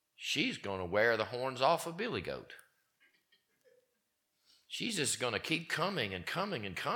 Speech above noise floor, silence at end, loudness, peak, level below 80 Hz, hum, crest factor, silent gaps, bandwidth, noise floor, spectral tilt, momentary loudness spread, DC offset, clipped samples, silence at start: 46 dB; 0 s; -35 LUFS; -16 dBFS; -72 dBFS; none; 22 dB; none; 19 kHz; -82 dBFS; -3 dB/octave; 10 LU; under 0.1%; under 0.1%; 0.2 s